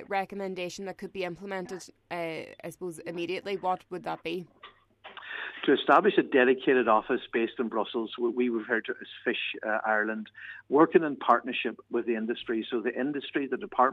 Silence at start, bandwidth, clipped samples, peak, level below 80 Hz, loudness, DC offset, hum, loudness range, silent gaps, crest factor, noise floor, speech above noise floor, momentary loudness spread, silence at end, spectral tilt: 0 s; 13 kHz; under 0.1%; -8 dBFS; -72 dBFS; -29 LUFS; under 0.1%; none; 10 LU; none; 22 dB; -49 dBFS; 21 dB; 16 LU; 0 s; -5.5 dB/octave